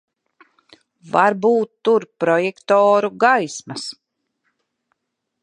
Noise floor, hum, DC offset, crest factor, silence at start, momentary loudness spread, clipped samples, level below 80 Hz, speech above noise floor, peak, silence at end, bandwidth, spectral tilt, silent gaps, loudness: -76 dBFS; none; under 0.1%; 18 dB; 1.05 s; 13 LU; under 0.1%; -74 dBFS; 59 dB; -2 dBFS; 1.5 s; 10.5 kHz; -4.5 dB/octave; none; -17 LUFS